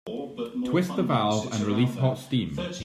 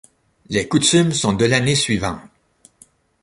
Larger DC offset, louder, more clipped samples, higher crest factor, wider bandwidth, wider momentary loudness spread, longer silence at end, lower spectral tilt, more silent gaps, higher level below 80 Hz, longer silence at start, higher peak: neither; second, -27 LUFS vs -17 LUFS; neither; about the same, 16 dB vs 18 dB; first, 14.5 kHz vs 11.5 kHz; about the same, 9 LU vs 10 LU; second, 0 s vs 0.95 s; first, -6.5 dB/octave vs -4 dB/octave; neither; second, -58 dBFS vs -46 dBFS; second, 0.05 s vs 0.5 s; second, -10 dBFS vs -2 dBFS